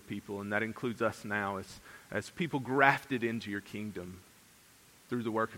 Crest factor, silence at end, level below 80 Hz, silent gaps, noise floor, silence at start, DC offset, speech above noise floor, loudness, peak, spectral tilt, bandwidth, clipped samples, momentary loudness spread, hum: 28 dB; 0 s; -70 dBFS; none; -61 dBFS; 0.05 s; under 0.1%; 26 dB; -34 LUFS; -8 dBFS; -5.5 dB/octave; 16.5 kHz; under 0.1%; 17 LU; none